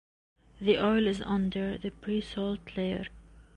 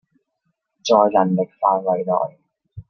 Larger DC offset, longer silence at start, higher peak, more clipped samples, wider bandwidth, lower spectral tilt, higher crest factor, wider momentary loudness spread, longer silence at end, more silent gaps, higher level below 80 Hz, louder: neither; second, 0.55 s vs 0.85 s; second, -14 dBFS vs -2 dBFS; neither; first, 9.6 kHz vs 7 kHz; about the same, -7 dB/octave vs -6 dB/octave; about the same, 18 dB vs 18 dB; about the same, 10 LU vs 10 LU; about the same, 0.15 s vs 0.1 s; neither; first, -52 dBFS vs -60 dBFS; second, -31 LUFS vs -19 LUFS